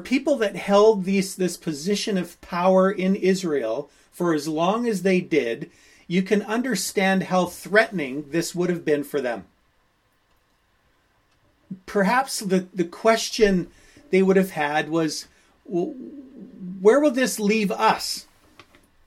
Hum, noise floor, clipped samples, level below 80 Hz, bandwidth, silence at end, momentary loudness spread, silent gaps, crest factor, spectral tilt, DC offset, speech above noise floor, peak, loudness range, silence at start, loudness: none; -65 dBFS; under 0.1%; -54 dBFS; 16 kHz; 0.85 s; 12 LU; none; 20 dB; -5 dB/octave; under 0.1%; 43 dB; -2 dBFS; 7 LU; 0 s; -22 LUFS